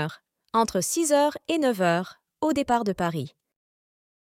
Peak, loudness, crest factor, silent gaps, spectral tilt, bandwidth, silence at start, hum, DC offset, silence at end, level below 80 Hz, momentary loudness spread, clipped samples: -8 dBFS; -25 LUFS; 18 dB; none; -4.5 dB/octave; 17 kHz; 0 s; none; under 0.1%; 1 s; -60 dBFS; 11 LU; under 0.1%